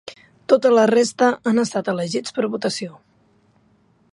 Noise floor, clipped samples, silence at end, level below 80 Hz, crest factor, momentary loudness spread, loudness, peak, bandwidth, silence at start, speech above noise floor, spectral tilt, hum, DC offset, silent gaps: -59 dBFS; under 0.1%; 1.2 s; -68 dBFS; 18 dB; 15 LU; -19 LUFS; -2 dBFS; 11.5 kHz; 0.05 s; 40 dB; -4.5 dB/octave; none; under 0.1%; none